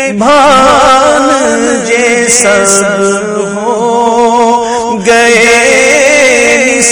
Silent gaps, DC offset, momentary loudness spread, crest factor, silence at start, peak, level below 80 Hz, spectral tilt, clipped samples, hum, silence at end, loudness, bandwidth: none; under 0.1%; 7 LU; 6 dB; 0 s; 0 dBFS; -38 dBFS; -2 dB/octave; 2%; none; 0 s; -6 LUFS; over 20 kHz